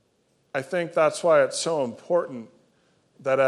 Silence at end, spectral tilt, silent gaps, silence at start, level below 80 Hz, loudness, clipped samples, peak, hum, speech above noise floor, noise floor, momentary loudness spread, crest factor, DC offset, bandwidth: 0 s; -4 dB/octave; none; 0.55 s; -80 dBFS; -24 LUFS; under 0.1%; -8 dBFS; none; 44 dB; -67 dBFS; 13 LU; 18 dB; under 0.1%; 12 kHz